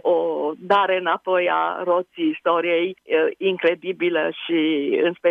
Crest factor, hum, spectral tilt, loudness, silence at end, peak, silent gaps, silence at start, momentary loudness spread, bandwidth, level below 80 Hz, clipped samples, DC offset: 14 dB; none; -7 dB/octave; -21 LUFS; 0 s; -6 dBFS; none; 0.05 s; 4 LU; 5.2 kHz; -74 dBFS; under 0.1%; under 0.1%